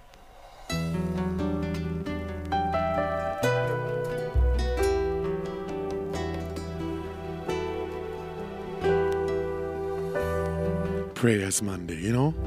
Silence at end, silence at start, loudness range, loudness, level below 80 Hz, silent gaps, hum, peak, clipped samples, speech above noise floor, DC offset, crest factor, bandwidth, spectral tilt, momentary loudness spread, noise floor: 0 s; 0.05 s; 4 LU; -29 LUFS; -38 dBFS; none; none; -10 dBFS; under 0.1%; 23 dB; under 0.1%; 20 dB; 15.5 kHz; -5.5 dB/octave; 9 LU; -49 dBFS